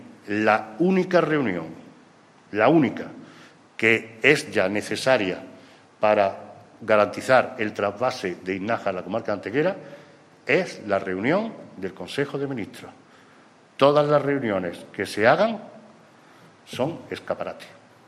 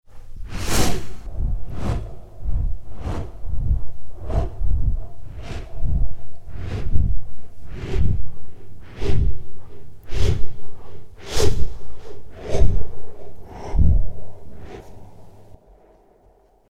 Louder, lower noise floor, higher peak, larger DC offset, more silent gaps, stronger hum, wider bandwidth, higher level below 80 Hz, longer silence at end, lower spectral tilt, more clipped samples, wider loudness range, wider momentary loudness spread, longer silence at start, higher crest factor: first, -23 LUFS vs -27 LUFS; about the same, -53 dBFS vs -55 dBFS; about the same, -2 dBFS vs 0 dBFS; neither; neither; neither; about the same, 13.5 kHz vs 14 kHz; second, -68 dBFS vs -26 dBFS; second, 0.4 s vs 1.15 s; about the same, -5.5 dB/octave vs -5.5 dB/octave; neither; about the same, 4 LU vs 2 LU; second, 17 LU vs 21 LU; second, 0 s vs 0.15 s; first, 22 dB vs 16 dB